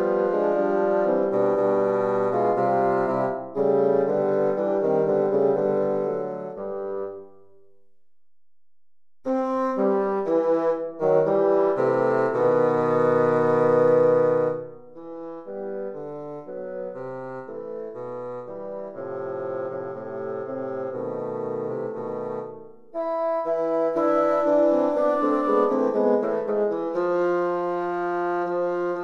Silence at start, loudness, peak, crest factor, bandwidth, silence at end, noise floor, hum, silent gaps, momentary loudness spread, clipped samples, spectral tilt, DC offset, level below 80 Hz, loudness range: 0 s; -23 LUFS; -8 dBFS; 16 dB; 6.8 kHz; 0 s; under -90 dBFS; none; none; 14 LU; under 0.1%; -9 dB/octave; under 0.1%; -66 dBFS; 12 LU